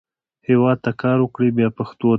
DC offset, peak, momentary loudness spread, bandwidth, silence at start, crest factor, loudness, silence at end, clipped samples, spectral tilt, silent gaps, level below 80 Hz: under 0.1%; -4 dBFS; 5 LU; 4.8 kHz; 0.5 s; 14 dB; -19 LUFS; 0 s; under 0.1%; -10.5 dB/octave; none; -58 dBFS